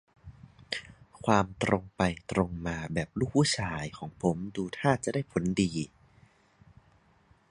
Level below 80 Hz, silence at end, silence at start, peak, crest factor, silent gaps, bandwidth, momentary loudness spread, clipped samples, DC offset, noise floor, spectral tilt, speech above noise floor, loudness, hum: -52 dBFS; 1.65 s; 0.25 s; -6 dBFS; 24 dB; none; 11 kHz; 11 LU; under 0.1%; under 0.1%; -64 dBFS; -5.5 dB/octave; 34 dB; -30 LUFS; none